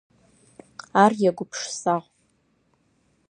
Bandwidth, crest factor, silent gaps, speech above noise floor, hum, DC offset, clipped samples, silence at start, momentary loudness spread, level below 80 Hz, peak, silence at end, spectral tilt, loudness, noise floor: 11 kHz; 24 dB; none; 45 dB; none; under 0.1%; under 0.1%; 0.95 s; 19 LU; -72 dBFS; -2 dBFS; 1.3 s; -4.5 dB/octave; -23 LUFS; -67 dBFS